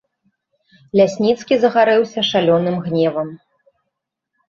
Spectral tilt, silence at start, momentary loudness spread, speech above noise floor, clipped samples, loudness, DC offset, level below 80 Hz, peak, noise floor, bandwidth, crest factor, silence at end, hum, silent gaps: -6 dB/octave; 0.95 s; 6 LU; 62 dB; under 0.1%; -16 LUFS; under 0.1%; -62 dBFS; -2 dBFS; -78 dBFS; 7.6 kHz; 16 dB; 1.15 s; none; none